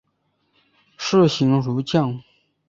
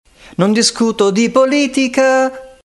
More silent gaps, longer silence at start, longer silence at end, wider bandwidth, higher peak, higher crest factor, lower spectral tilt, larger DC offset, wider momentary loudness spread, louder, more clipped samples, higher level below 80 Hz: neither; first, 1 s vs 0.4 s; first, 0.5 s vs 0.15 s; second, 7.6 kHz vs 12 kHz; about the same, -4 dBFS vs -2 dBFS; first, 18 dB vs 12 dB; first, -6.5 dB/octave vs -4 dB/octave; neither; first, 11 LU vs 5 LU; second, -20 LUFS vs -13 LUFS; neither; second, -60 dBFS vs -52 dBFS